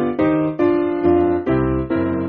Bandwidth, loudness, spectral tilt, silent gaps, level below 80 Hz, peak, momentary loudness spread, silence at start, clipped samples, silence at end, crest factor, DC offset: 4.5 kHz; -18 LUFS; -8 dB/octave; none; -38 dBFS; -4 dBFS; 4 LU; 0 s; under 0.1%; 0 s; 14 dB; under 0.1%